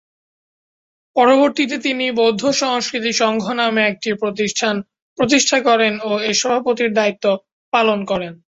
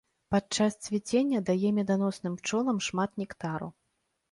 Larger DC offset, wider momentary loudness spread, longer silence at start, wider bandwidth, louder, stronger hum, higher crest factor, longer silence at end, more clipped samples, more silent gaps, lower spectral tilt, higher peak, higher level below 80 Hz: neither; about the same, 8 LU vs 8 LU; first, 1.15 s vs 0.3 s; second, 8 kHz vs 11.5 kHz; first, -17 LUFS vs -30 LUFS; neither; about the same, 16 dB vs 16 dB; second, 0.1 s vs 0.6 s; neither; first, 5.02-5.16 s, 7.52-7.72 s vs none; second, -3 dB/octave vs -5 dB/octave; first, -2 dBFS vs -14 dBFS; about the same, -60 dBFS vs -64 dBFS